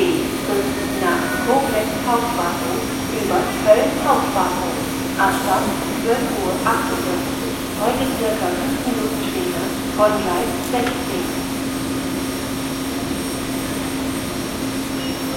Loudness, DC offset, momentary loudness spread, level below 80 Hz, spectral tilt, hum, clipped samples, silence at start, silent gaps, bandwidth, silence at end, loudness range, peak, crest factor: -20 LUFS; under 0.1%; 6 LU; -42 dBFS; -4 dB/octave; none; under 0.1%; 0 s; none; 16.5 kHz; 0 s; 5 LU; -2 dBFS; 18 dB